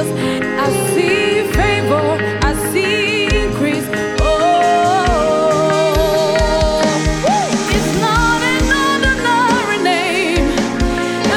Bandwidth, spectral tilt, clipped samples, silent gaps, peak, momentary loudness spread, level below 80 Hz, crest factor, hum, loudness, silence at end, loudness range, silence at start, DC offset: 17.5 kHz; -4.5 dB/octave; under 0.1%; none; -2 dBFS; 4 LU; -26 dBFS; 12 dB; none; -14 LUFS; 0 s; 1 LU; 0 s; under 0.1%